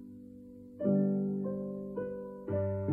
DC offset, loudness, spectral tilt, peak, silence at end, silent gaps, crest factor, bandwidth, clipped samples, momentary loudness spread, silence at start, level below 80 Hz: under 0.1%; -34 LUFS; -12.5 dB/octave; -18 dBFS; 0 s; none; 16 dB; 2.5 kHz; under 0.1%; 21 LU; 0 s; -66 dBFS